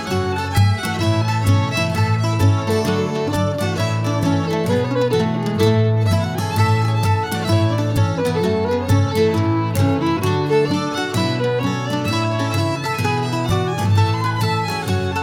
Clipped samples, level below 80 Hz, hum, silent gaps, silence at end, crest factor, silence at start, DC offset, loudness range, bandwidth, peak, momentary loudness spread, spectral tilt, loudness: under 0.1%; -46 dBFS; none; none; 0 s; 14 dB; 0 s; under 0.1%; 2 LU; 16.5 kHz; -4 dBFS; 4 LU; -6.5 dB/octave; -19 LUFS